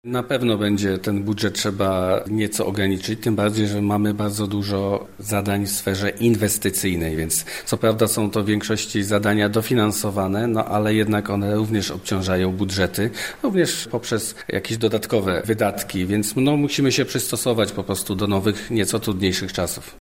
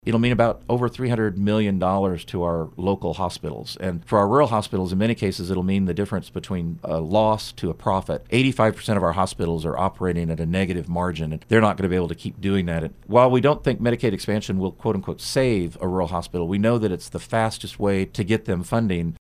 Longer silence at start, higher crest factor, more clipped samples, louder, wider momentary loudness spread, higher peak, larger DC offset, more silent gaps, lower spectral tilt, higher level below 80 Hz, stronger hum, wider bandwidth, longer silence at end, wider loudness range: about the same, 0.05 s vs 0.05 s; about the same, 18 dB vs 20 dB; neither; about the same, -21 LUFS vs -23 LUFS; second, 5 LU vs 8 LU; about the same, -4 dBFS vs -2 dBFS; first, 0.3% vs under 0.1%; neither; second, -4.5 dB/octave vs -6.5 dB/octave; about the same, -48 dBFS vs -44 dBFS; neither; first, 16.5 kHz vs 14.5 kHz; about the same, 0.05 s vs 0.1 s; about the same, 2 LU vs 3 LU